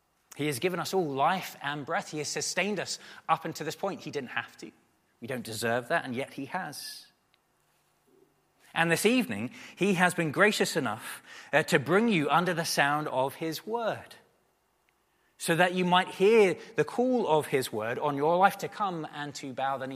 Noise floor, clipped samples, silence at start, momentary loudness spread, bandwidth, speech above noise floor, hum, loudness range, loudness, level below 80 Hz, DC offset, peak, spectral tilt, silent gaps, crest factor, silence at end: -71 dBFS; under 0.1%; 0.35 s; 13 LU; 15.5 kHz; 43 dB; none; 8 LU; -28 LUFS; -76 dBFS; under 0.1%; -8 dBFS; -4 dB/octave; none; 22 dB; 0 s